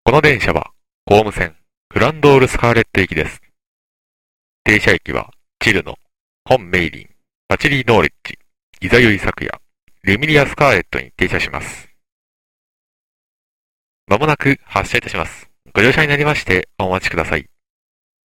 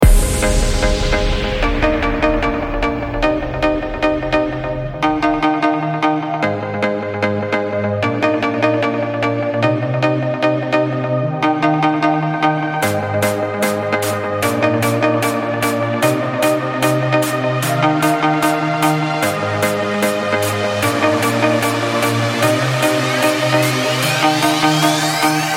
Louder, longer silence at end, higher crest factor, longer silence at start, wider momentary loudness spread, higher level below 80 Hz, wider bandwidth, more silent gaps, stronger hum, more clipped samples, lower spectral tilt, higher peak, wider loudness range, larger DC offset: about the same, -15 LUFS vs -16 LUFS; first, 0.85 s vs 0 s; about the same, 16 dB vs 16 dB; about the same, 0.05 s vs 0 s; first, 14 LU vs 4 LU; second, -36 dBFS vs -26 dBFS; about the same, 16.5 kHz vs 16.5 kHz; first, 0.94-1.07 s, 1.77-1.90 s, 3.67-4.65 s, 6.20-6.45 s, 7.35-7.49 s, 8.63-8.73 s, 9.83-9.87 s, 12.12-14.07 s vs none; neither; neither; about the same, -5.5 dB/octave vs -5 dB/octave; about the same, 0 dBFS vs 0 dBFS; about the same, 5 LU vs 3 LU; first, 0.3% vs under 0.1%